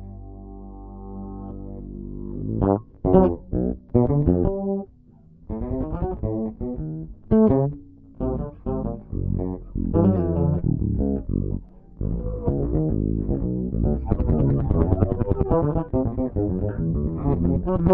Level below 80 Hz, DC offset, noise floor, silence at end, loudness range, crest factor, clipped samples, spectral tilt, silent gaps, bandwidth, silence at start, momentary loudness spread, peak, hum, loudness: -32 dBFS; under 0.1%; -50 dBFS; 0 s; 3 LU; 22 dB; under 0.1%; -12.5 dB/octave; none; 3.3 kHz; 0 s; 16 LU; -2 dBFS; none; -24 LUFS